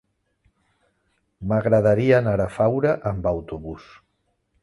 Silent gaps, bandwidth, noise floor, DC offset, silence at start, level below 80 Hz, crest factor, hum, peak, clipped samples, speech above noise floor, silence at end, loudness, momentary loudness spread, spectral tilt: none; 11.5 kHz; -71 dBFS; under 0.1%; 1.4 s; -46 dBFS; 18 dB; none; -4 dBFS; under 0.1%; 51 dB; 0.8 s; -21 LUFS; 17 LU; -9 dB/octave